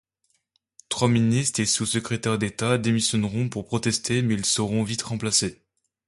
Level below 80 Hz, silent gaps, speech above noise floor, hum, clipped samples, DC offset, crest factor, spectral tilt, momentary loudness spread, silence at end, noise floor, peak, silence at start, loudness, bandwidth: -54 dBFS; none; 48 dB; none; under 0.1%; under 0.1%; 20 dB; -4 dB/octave; 6 LU; 0.55 s; -72 dBFS; -6 dBFS; 0.9 s; -24 LUFS; 11.5 kHz